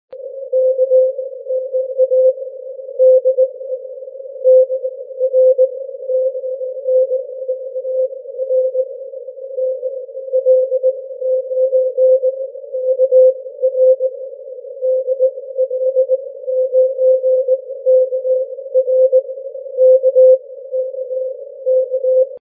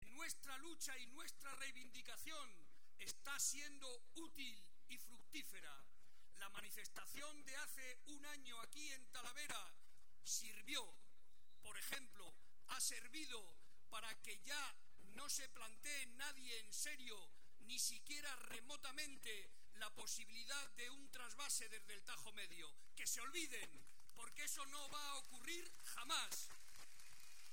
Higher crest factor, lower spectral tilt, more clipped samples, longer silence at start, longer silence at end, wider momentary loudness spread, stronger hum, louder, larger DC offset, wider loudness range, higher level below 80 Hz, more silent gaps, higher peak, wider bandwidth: second, 12 dB vs 24 dB; first, -8.5 dB/octave vs 0 dB/octave; neither; about the same, 0.1 s vs 0 s; about the same, 0 s vs 0 s; about the same, 15 LU vs 16 LU; neither; first, -15 LUFS vs -50 LUFS; second, under 0.1% vs 0.4%; about the same, 5 LU vs 5 LU; second, under -90 dBFS vs -82 dBFS; neither; first, -2 dBFS vs -30 dBFS; second, 0.6 kHz vs 17 kHz